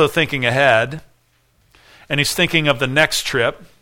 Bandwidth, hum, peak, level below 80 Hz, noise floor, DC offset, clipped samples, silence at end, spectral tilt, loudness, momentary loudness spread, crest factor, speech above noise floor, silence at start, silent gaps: 18 kHz; none; 0 dBFS; -46 dBFS; -59 dBFS; under 0.1%; under 0.1%; 0.15 s; -3.5 dB/octave; -16 LUFS; 8 LU; 18 dB; 42 dB; 0 s; none